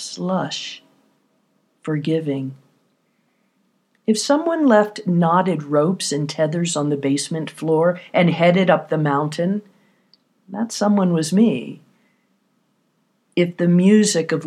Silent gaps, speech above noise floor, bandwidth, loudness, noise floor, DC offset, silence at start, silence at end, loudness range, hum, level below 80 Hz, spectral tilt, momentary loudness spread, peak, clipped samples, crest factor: none; 48 dB; 13 kHz; -19 LUFS; -66 dBFS; under 0.1%; 0 s; 0 s; 8 LU; none; -78 dBFS; -5.5 dB/octave; 12 LU; -2 dBFS; under 0.1%; 18 dB